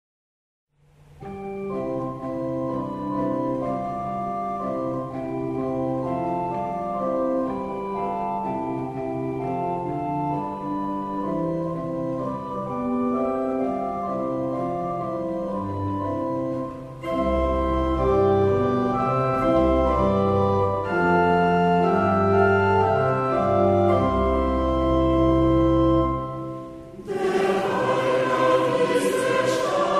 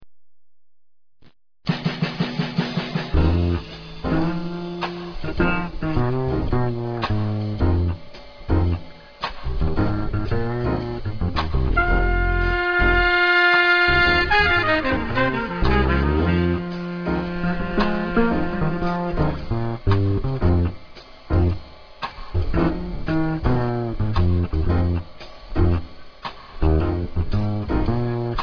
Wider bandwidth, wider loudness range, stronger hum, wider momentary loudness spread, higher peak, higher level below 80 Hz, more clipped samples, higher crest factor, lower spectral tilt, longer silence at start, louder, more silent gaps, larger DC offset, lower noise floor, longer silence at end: first, 13.5 kHz vs 5.4 kHz; about the same, 7 LU vs 8 LU; neither; second, 10 LU vs 13 LU; about the same, -8 dBFS vs -6 dBFS; second, -38 dBFS vs -28 dBFS; neither; about the same, 16 dB vs 16 dB; about the same, -7.5 dB/octave vs -8 dB/octave; first, 1.2 s vs 0 s; about the same, -23 LUFS vs -22 LUFS; neither; neither; second, -53 dBFS vs -62 dBFS; about the same, 0 s vs 0 s